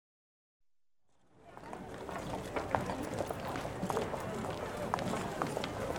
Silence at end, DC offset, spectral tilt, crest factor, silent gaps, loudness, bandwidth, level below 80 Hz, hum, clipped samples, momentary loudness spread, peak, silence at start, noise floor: 0 s; under 0.1%; -5.5 dB/octave; 28 dB; none; -38 LUFS; 17.5 kHz; -56 dBFS; none; under 0.1%; 10 LU; -12 dBFS; 1.35 s; -86 dBFS